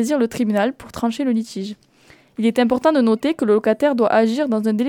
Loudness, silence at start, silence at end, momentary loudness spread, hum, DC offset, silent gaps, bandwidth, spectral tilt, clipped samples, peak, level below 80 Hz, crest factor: -19 LUFS; 0 s; 0 s; 9 LU; none; under 0.1%; none; 15 kHz; -6 dB/octave; under 0.1%; -4 dBFS; -56 dBFS; 14 dB